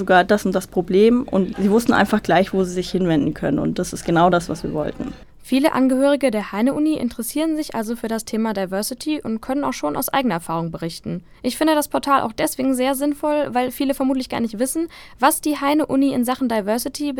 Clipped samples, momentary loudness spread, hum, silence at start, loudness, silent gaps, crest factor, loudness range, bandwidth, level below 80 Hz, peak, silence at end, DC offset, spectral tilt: under 0.1%; 9 LU; none; 0 s; -20 LUFS; none; 18 dB; 5 LU; 18.5 kHz; -46 dBFS; -2 dBFS; 0 s; under 0.1%; -5 dB/octave